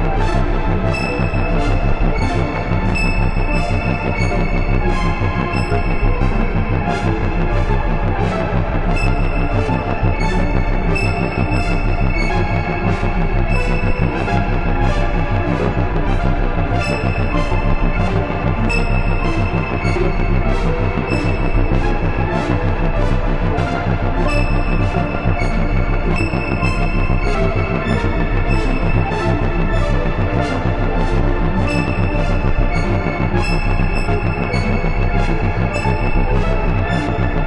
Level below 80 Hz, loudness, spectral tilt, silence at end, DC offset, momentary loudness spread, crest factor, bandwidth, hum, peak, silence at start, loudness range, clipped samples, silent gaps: -18 dBFS; -18 LUFS; -7.5 dB/octave; 0 s; under 0.1%; 1 LU; 14 dB; 8.4 kHz; none; -2 dBFS; 0 s; 0 LU; under 0.1%; none